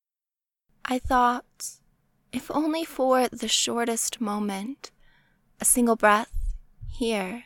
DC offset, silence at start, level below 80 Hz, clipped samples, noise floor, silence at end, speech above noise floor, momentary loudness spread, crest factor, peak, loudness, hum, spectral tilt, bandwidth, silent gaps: under 0.1%; 0.85 s; -42 dBFS; under 0.1%; under -90 dBFS; 0.05 s; over 65 dB; 17 LU; 20 dB; -6 dBFS; -24 LUFS; none; -2.5 dB/octave; 19 kHz; none